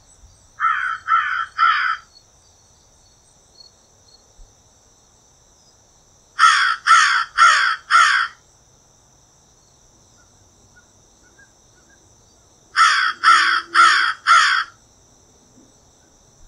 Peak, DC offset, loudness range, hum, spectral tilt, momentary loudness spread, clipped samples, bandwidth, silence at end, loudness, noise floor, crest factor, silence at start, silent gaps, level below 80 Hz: 0 dBFS; under 0.1%; 9 LU; none; 2 dB/octave; 10 LU; under 0.1%; 12 kHz; 1.8 s; -15 LUFS; -54 dBFS; 20 dB; 0.6 s; none; -60 dBFS